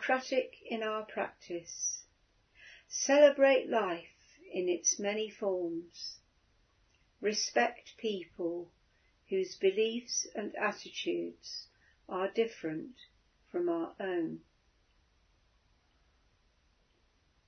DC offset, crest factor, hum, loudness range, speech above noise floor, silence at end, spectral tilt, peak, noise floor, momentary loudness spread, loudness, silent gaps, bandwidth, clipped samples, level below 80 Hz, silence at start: under 0.1%; 24 dB; none; 10 LU; 39 dB; 3.1 s; -2 dB/octave; -12 dBFS; -72 dBFS; 14 LU; -33 LUFS; none; 6.4 kHz; under 0.1%; -76 dBFS; 0 s